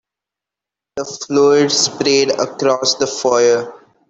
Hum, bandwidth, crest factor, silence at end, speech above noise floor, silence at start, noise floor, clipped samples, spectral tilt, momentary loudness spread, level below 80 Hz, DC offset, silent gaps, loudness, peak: none; 8.4 kHz; 16 dB; 0.35 s; 71 dB; 0.95 s; -86 dBFS; under 0.1%; -2.5 dB/octave; 14 LU; -60 dBFS; under 0.1%; none; -14 LUFS; -2 dBFS